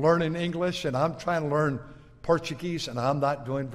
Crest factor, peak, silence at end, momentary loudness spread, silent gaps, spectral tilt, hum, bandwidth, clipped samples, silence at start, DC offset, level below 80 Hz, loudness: 18 dB; -10 dBFS; 0 s; 6 LU; none; -6 dB/octave; none; 13.5 kHz; under 0.1%; 0 s; under 0.1%; -54 dBFS; -28 LUFS